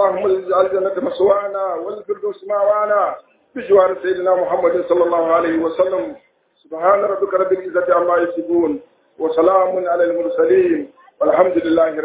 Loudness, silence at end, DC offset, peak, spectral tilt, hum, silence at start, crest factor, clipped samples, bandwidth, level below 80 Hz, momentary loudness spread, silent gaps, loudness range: -17 LUFS; 0 s; under 0.1%; 0 dBFS; -9.5 dB/octave; none; 0 s; 16 dB; under 0.1%; 4 kHz; -58 dBFS; 10 LU; none; 2 LU